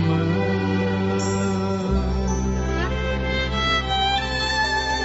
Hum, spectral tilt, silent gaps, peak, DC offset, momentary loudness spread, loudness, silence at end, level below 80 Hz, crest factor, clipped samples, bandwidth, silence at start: none; -4 dB/octave; none; -8 dBFS; under 0.1%; 3 LU; -22 LUFS; 0 s; -30 dBFS; 12 dB; under 0.1%; 8 kHz; 0 s